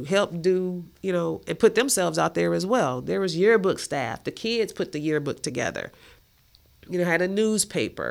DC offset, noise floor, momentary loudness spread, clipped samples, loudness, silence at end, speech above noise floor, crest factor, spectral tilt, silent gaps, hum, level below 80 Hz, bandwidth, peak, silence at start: under 0.1%; -59 dBFS; 9 LU; under 0.1%; -24 LUFS; 0 s; 34 dB; 20 dB; -4 dB/octave; none; none; -58 dBFS; 16.5 kHz; -6 dBFS; 0 s